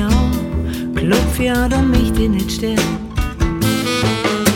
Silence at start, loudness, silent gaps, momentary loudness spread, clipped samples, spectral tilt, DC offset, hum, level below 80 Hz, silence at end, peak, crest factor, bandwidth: 0 s; -17 LUFS; none; 6 LU; under 0.1%; -5 dB/octave; under 0.1%; none; -22 dBFS; 0 s; 0 dBFS; 16 dB; 17 kHz